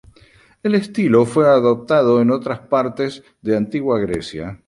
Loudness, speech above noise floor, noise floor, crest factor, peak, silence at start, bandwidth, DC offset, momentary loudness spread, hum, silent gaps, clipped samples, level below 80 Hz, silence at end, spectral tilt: -17 LUFS; 34 dB; -51 dBFS; 16 dB; -2 dBFS; 0.65 s; 11.5 kHz; under 0.1%; 12 LU; none; none; under 0.1%; -50 dBFS; 0.1 s; -7 dB/octave